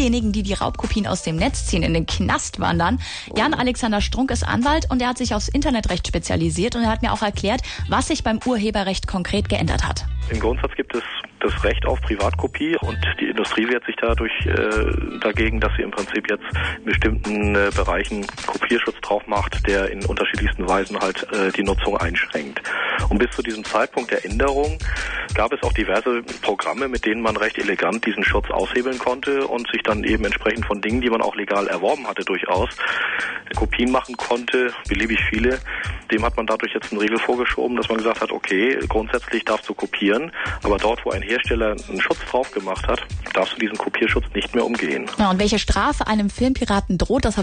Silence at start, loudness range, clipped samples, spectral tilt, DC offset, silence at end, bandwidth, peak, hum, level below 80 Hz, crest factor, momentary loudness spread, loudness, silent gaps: 0 s; 1 LU; under 0.1%; -5 dB/octave; under 0.1%; 0 s; 10 kHz; -8 dBFS; none; -30 dBFS; 14 dB; 4 LU; -21 LUFS; none